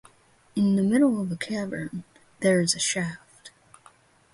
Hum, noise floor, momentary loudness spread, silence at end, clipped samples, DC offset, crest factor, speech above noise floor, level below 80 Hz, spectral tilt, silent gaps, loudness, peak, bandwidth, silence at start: none; -59 dBFS; 13 LU; 0.85 s; under 0.1%; under 0.1%; 18 dB; 35 dB; -64 dBFS; -4.5 dB/octave; none; -25 LUFS; -10 dBFS; 11.5 kHz; 0.55 s